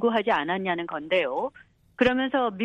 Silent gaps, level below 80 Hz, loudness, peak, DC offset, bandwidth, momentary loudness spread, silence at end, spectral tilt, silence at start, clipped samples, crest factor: none; -58 dBFS; -26 LUFS; -10 dBFS; under 0.1%; 8.2 kHz; 7 LU; 0 s; -6.5 dB/octave; 0 s; under 0.1%; 16 dB